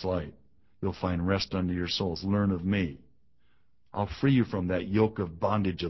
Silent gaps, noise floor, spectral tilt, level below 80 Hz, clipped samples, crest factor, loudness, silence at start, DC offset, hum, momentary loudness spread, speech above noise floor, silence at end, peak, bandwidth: none; -72 dBFS; -7 dB/octave; -46 dBFS; under 0.1%; 18 dB; -29 LUFS; 0 s; 0.1%; none; 9 LU; 43 dB; 0 s; -12 dBFS; 6.2 kHz